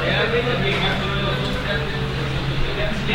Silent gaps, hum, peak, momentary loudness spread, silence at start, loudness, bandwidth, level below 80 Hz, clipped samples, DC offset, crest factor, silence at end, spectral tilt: none; none; -6 dBFS; 5 LU; 0 s; -22 LUFS; 16 kHz; -30 dBFS; under 0.1%; under 0.1%; 14 dB; 0 s; -6 dB/octave